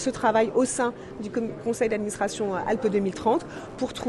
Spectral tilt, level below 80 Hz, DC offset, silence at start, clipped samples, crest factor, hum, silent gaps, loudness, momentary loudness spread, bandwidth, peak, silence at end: -4.5 dB/octave; -56 dBFS; under 0.1%; 0 s; under 0.1%; 16 dB; none; none; -26 LUFS; 9 LU; 12 kHz; -10 dBFS; 0 s